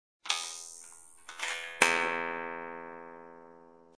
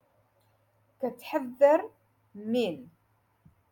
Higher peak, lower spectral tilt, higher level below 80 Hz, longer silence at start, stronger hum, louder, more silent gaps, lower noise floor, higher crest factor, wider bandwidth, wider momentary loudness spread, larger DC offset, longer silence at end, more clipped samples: first, -6 dBFS vs -10 dBFS; second, -0.5 dB/octave vs -6 dB/octave; about the same, -80 dBFS vs -78 dBFS; second, 0.25 s vs 1 s; neither; second, -32 LUFS vs -28 LUFS; neither; second, -56 dBFS vs -70 dBFS; first, 30 dB vs 22 dB; second, 11 kHz vs 17.5 kHz; first, 24 LU vs 20 LU; neither; second, 0.05 s vs 0.85 s; neither